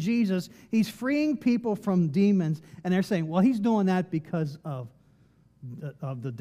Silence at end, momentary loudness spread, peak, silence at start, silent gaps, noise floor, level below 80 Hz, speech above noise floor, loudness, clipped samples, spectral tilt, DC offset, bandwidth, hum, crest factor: 0 s; 15 LU; -12 dBFS; 0 s; none; -61 dBFS; -70 dBFS; 34 dB; -27 LUFS; under 0.1%; -7.5 dB/octave; under 0.1%; 14.5 kHz; none; 16 dB